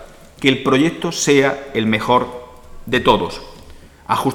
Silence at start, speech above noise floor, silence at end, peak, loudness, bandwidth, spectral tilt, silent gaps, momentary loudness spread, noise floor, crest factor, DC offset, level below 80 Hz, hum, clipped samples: 0 s; 24 dB; 0 s; 0 dBFS; -17 LUFS; 17.5 kHz; -4.5 dB/octave; none; 13 LU; -40 dBFS; 18 dB; under 0.1%; -42 dBFS; none; under 0.1%